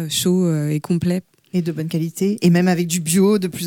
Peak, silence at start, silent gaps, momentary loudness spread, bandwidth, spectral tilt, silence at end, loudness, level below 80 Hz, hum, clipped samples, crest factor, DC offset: -4 dBFS; 0 s; none; 8 LU; 17.5 kHz; -5.5 dB/octave; 0 s; -19 LUFS; -58 dBFS; none; under 0.1%; 14 dB; under 0.1%